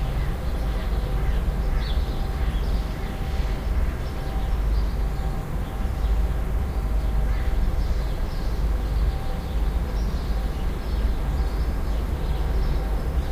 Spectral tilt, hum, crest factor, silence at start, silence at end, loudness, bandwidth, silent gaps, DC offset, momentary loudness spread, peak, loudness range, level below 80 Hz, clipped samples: -7 dB/octave; none; 12 dB; 0 s; 0 s; -27 LUFS; 15.5 kHz; none; under 0.1%; 3 LU; -12 dBFS; 1 LU; -24 dBFS; under 0.1%